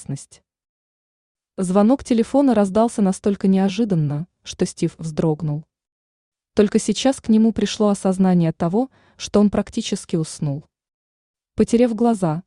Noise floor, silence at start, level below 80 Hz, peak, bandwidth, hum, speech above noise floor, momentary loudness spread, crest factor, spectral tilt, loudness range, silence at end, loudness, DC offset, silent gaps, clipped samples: under -90 dBFS; 0 s; -50 dBFS; -4 dBFS; 11 kHz; none; over 71 dB; 11 LU; 16 dB; -6.5 dB/octave; 4 LU; 0.05 s; -19 LUFS; under 0.1%; 0.69-1.35 s, 5.92-6.32 s, 10.94-11.34 s; under 0.1%